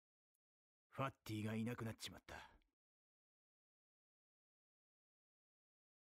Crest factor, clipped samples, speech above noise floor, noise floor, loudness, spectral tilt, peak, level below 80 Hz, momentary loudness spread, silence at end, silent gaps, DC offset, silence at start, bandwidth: 22 dB; under 0.1%; over 42 dB; under -90 dBFS; -49 LUFS; -5.5 dB/octave; -32 dBFS; -78 dBFS; 13 LU; 3.45 s; none; under 0.1%; 0.95 s; 15.5 kHz